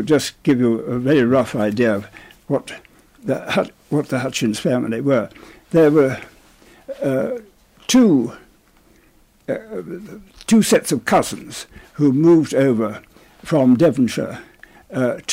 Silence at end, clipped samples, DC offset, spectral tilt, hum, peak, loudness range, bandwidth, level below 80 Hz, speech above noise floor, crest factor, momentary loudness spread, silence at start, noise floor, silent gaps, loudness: 0 s; under 0.1%; under 0.1%; -5.5 dB/octave; none; -6 dBFS; 4 LU; 16 kHz; -54 dBFS; 36 dB; 14 dB; 19 LU; 0 s; -54 dBFS; none; -18 LUFS